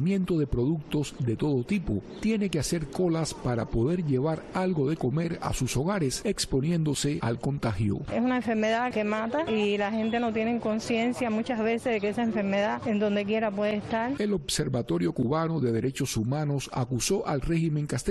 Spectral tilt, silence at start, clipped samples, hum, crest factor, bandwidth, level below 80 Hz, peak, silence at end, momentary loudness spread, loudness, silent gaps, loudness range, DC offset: -5.5 dB/octave; 0 s; under 0.1%; none; 12 dB; 12.5 kHz; -46 dBFS; -14 dBFS; 0 s; 3 LU; -28 LUFS; none; 1 LU; under 0.1%